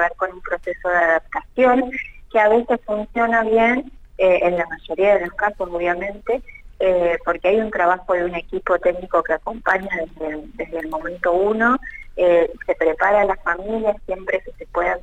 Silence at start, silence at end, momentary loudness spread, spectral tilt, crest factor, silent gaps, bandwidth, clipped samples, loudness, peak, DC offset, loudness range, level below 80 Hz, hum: 0 s; 0 s; 10 LU; -6.5 dB/octave; 16 dB; none; 8 kHz; under 0.1%; -20 LUFS; -4 dBFS; under 0.1%; 3 LU; -42 dBFS; none